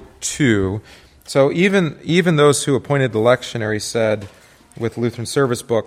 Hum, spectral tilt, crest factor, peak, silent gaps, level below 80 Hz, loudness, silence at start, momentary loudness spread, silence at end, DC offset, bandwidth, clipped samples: none; -5 dB/octave; 16 dB; -2 dBFS; none; -50 dBFS; -18 LUFS; 0 s; 10 LU; 0 s; under 0.1%; 15.5 kHz; under 0.1%